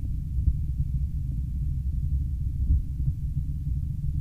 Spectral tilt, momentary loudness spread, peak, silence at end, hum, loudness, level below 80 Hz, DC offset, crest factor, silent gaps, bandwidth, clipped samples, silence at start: -10 dB/octave; 4 LU; -12 dBFS; 0 s; none; -30 LUFS; -28 dBFS; under 0.1%; 16 dB; none; 0.7 kHz; under 0.1%; 0 s